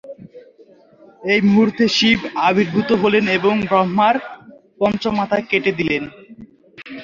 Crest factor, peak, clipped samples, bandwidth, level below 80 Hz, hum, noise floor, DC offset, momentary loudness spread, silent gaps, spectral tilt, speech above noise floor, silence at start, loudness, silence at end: 16 dB; -2 dBFS; under 0.1%; 7.4 kHz; -52 dBFS; none; -48 dBFS; under 0.1%; 9 LU; none; -5.5 dB/octave; 32 dB; 0.05 s; -17 LUFS; 0 s